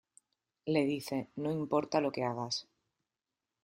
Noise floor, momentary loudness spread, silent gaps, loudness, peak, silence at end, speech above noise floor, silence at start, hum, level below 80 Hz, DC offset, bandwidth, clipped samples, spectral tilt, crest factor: under -90 dBFS; 7 LU; none; -34 LUFS; -16 dBFS; 1 s; over 57 dB; 0.65 s; none; -74 dBFS; under 0.1%; 15 kHz; under 0.1%; -5.5 dB/octave; 20 dB